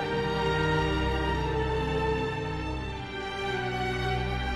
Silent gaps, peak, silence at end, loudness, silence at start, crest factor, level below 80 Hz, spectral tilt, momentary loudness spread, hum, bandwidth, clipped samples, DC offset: none; -14 dBFS; 0 s; -29 LUFS; 0 s; 14 dB; -36 dBFS; -6 dB/octave; 8 LU; none; 12 kHz; under 0.1%; under 0.1%